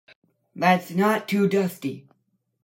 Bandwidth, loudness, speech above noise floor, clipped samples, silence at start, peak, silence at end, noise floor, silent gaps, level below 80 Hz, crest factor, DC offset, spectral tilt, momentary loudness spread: 16.5 kHz; -23 LUFS; 50 dB; under 0.1%; 0.55 s; -6 dBFS; 0.65 s; -72 dBFS; none; -72 dBFS; 20 dB; under 0.1%; -6.5 dB/octave; 12 LU